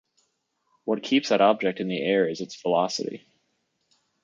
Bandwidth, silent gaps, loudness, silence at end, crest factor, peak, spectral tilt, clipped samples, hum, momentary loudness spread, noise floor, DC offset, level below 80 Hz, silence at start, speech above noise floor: 7.6 kHz; none; -24 LUFS; 1.05 s; 22 dB; -4 dBFS; -4.5 dB/octave; under 0.1%; none; 12 LU; -74 dBFS; under 0.1%; -76 dBFS; 0.85 s; 50 dB